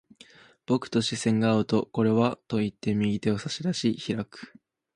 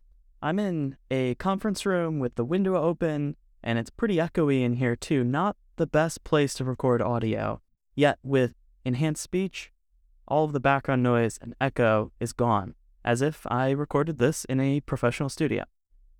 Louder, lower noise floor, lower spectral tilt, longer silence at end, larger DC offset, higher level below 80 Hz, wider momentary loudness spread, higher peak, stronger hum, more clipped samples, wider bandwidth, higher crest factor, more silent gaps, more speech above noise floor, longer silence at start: about the same, -27 LUFS vs -27 LUFS; second, -54 dBFS vs -62 dBFS; about the same, -6 dB/octave vs -6.5 dB/octave; about the same, 0.5 s vs 0.55 s; neither; second, -60 dBFS vs -52 dBFS; about the same, 8 LU vs 8 LU; about the same, -8 dBFS vs -8 dBFS; neither; neither; second, 11 kHz vs 17.5 kHz; about the same, 18 dB vs 18 dB; neither; second, 28 dB vs 36 dB; first, 0.7 s vs 0.4 s